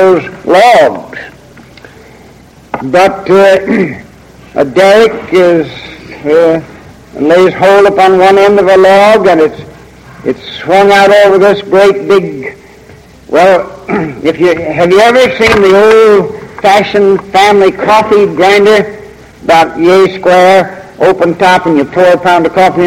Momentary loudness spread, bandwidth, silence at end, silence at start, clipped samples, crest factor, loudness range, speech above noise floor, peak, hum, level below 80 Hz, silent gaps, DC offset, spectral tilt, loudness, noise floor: 14 LU; 15.5 kHz; 0 s; 0 s; 0.9%; 6 dB; 4 LU; 30 dB; 0 dBFS; none; -40 dBFS; none; under 0.1%; -5 dB/octave; -6 LUFS; -36 dBFS